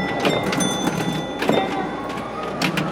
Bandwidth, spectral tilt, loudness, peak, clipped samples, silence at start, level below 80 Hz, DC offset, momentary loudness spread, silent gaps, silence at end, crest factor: 17 kHz; -4.5 dB/octave; -22 LUFS; -4 dBFS; under 0.1%; 0 s; -48 dBFS; under 0.1%; 7 LU; none; 0 s; 18 dB